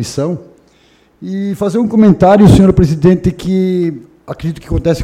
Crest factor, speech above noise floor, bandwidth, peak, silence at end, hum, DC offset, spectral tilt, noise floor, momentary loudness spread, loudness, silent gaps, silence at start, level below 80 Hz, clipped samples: 12 dB; 39 dB; 13 kHz; 0 dBFS; 0 s; none; under 0.1%; -8 dB/octave; -49 dBFS; 17 LU; -11 LUFS; none; 0 s; -28 dBFS; 0.6%